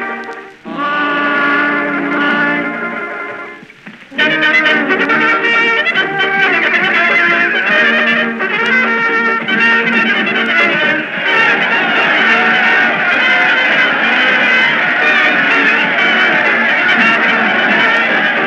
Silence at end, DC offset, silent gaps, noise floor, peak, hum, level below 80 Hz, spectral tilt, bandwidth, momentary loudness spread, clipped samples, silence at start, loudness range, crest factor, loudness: 0 s; under 0.1%; none; -35 dBFS; 0 dBFS; none; -60 dBFS; -4 dB/octave; 9.4 kHz; 7 LU; under 0.1%; 0 s; 5 LU; 12 dB; -10 LUFS